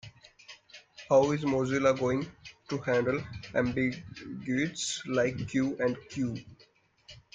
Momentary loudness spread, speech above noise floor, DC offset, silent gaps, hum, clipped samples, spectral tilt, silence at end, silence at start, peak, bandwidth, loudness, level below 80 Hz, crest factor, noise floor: 21 LU; 34 dB; under 0.1%; none; none; under 0.1%; -5.5 dB/octave; 0.15 s; 0.05 s; -12 dBFS; 9.4 kHz; -30 LUFS; -62 dBFS; 20 dB; -64 dBFS